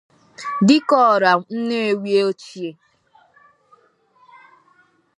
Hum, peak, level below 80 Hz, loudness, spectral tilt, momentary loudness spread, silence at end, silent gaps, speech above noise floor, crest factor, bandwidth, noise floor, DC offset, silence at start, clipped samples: none; -2 dBFS; -74 dBFS; -17 LUFS; -5.5 dB/octave; 18 LU; 2.45 s; none; 40 dB; 20 dB; 10.5 kHz; -58 dBFS; under 0.1%; 0.4 s; under 0.1%